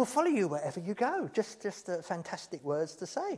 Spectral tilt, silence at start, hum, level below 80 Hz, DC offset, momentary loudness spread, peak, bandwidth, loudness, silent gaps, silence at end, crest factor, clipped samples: -5 dB/octave; 0 s; none; -82 dBFS; under 0.1%; 10 LU; -16 dBFS; 11 kHz; -34 LUFS; none; 0 s; 18 dB; under 0.1%